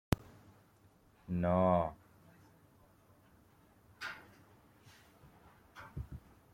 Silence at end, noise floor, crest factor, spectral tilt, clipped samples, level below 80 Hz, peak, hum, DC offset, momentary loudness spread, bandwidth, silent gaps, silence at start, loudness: 0.35 s; -66 dBFS; 28 dB; -7.5 dB/octave; under 0.1%; -58 dBFS; -12 dBFS; none; under 0.1%; 28 LU; 16.5 kHz; none; 0.1 s; -36 LUFS